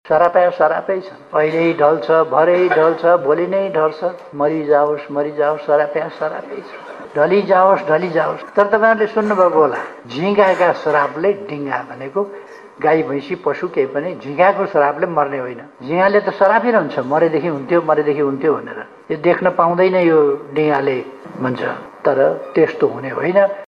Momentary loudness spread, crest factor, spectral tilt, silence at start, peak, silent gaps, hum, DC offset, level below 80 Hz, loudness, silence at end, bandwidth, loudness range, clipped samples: 11 LU; 16 dB; -7.5 dB/octave; 0.05 s; 0 dBFS; none; none; under 0.1%; -64 dBFS; -16 LUFS; 0.05 s; 7.2 kHz; 4 LU; under 0.1%